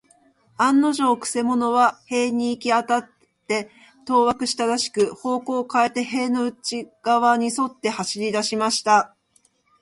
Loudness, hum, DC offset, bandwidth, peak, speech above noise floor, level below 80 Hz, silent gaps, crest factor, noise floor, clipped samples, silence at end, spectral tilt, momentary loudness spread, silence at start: -21 LUFS; none; under 0.1%; 11.5 kHz; -4 dBFS; 42 dB; -66 dBFS; none; 18 dB; -63 dBFS; under 0.1%; 0.75 s; -3 dB/octave; 8 LU; 0.6 s